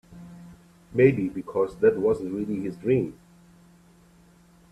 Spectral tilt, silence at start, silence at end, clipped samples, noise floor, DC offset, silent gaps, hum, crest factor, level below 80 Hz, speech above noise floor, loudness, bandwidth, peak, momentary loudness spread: -9 dB/octave; 0.1 s; 1.6 s; under 0.1%; -56 dBFS; under 0.1%; none; none; 22 dB; -58 dBFS; 32 dB; -25 LUFS; 11 kHz; -4 dBFS; 17 LU